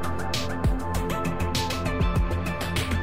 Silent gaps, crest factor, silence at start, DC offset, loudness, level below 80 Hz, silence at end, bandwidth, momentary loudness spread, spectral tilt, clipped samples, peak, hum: none; 14 dB; 0 s; 1%; -27 LUFS; -32 dBFS; 0 s; 16 kHz; 3 LU; -5 dB/octave; under 0.1%; -12 dBFS; none